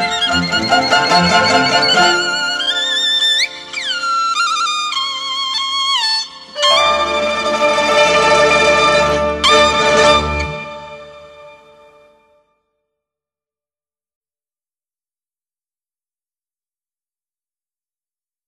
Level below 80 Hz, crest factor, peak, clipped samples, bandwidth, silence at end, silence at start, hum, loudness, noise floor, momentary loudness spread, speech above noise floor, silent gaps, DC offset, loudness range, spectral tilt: -40 dBFS; 16 dB; 0 dBFS; under 0.1%; 13 kHz; 6.95 s; 0 s; none; -13 LUFS; under -90 dBFS; 8 LU; over 78 dB; none; under 0.1%; 5 LU; -2.5 dB/octave